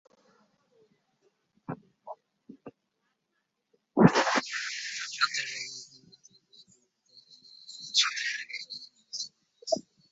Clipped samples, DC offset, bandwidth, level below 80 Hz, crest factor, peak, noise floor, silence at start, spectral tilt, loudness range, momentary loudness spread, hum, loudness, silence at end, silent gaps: under 0.1%; under 0.1%; 8 kHz; -68 dBFS; 30 dB; -4 dBFS; -80 dBFS; 1.7 s; -3 dB/octave; 21 LU; 26 LU; none; -29 LUFS; 0.3 s; none